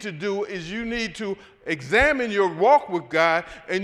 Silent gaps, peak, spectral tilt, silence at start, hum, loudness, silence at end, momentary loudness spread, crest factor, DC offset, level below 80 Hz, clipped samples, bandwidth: none; -6 dBFS; -4.5 dB/octave; 0 s; none; -22 LUFS; 0 s; 12 LU; 16 dB; under 0.1%; -46 dBFS; under 0.1%; 12.5 kHz